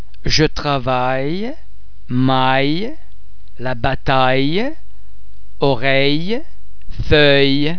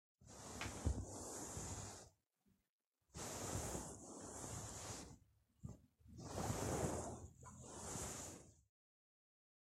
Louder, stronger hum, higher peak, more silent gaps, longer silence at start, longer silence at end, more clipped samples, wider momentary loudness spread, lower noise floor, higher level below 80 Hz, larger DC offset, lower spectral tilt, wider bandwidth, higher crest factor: first, -16 LUFS vs -49 LUFS; neither; first, 0 dBFS vs -28 dBFS; second, none vs 2.69-2.79 s, 2.87-2.92 s; second, 0 s vs 0.2 s; second, 0 s vs 1.1 s; neither; second, 13 LU vs 16 LU; second, -43 dBFS vs under -90 dBFS; first, -32 dBFS vs -58 dBFS; first, 10% vs under 0.1%; first, -5.5 dB/octave vs -4 dB/octave; second, 5.4 kHz vs 16 kHz; about the same, 18 dB vs 22 dB